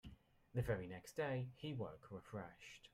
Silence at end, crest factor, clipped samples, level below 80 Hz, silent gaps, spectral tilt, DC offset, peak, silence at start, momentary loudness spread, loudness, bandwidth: 0.05 s; 18 dB; under 0.1%; -64 dBFS; none; -6.5 dB/octave; under 0.1%; -28 dBFS; 0.05 s; 13 LU; -47 LUFS; 15 kHz